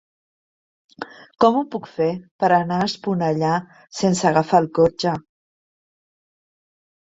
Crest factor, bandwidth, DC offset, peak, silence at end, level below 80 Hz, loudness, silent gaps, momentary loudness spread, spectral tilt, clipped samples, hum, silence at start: 20 dB; 8 kHz; under 0.1%; -2 dBFS; 1.85 s; -58 dBFS; -20 LUFS; 2.31-2.39 s; 16 LU; -5.5 dB/octave; under 0.1%; none; 1 s